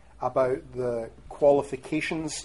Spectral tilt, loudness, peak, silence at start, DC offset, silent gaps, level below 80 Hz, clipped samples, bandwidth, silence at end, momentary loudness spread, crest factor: -5 dB/octave; -27 LUFS; -10 dBFS; 0.2 s; 0.2%; none; -54 dBFS; under 0.1%; 11.5 kHz; 0 s; 9 LU; 18 dB